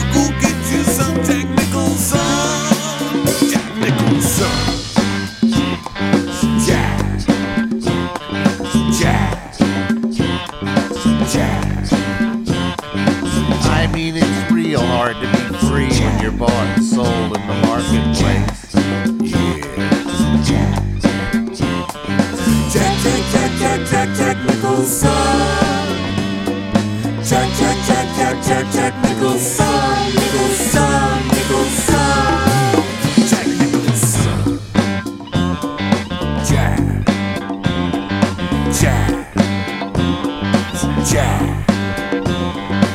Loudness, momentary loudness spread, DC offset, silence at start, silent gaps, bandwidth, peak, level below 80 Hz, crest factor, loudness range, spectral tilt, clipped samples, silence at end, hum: -16 LUFS; 5 LU; under 0.1%; 0 s; none; 16.5 kHz; 0 dBFS; -30 dBFS; 16 dB; 3 LU; -5 dB/octave; under 0.1%; 0 s; none